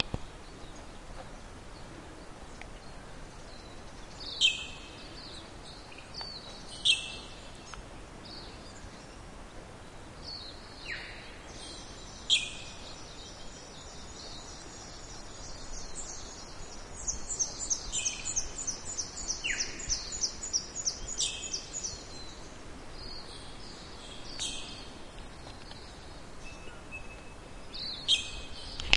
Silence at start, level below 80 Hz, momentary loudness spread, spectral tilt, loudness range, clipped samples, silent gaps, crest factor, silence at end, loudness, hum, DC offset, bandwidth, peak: 0 s; -50 dBFS; 20 LU; -0.5 dB/octave; 13 LU; under 0.1%; none; 36 dB; 0 s; -35 LUFS; none; under 0.1%; 11.5 kHz; -2 dBFS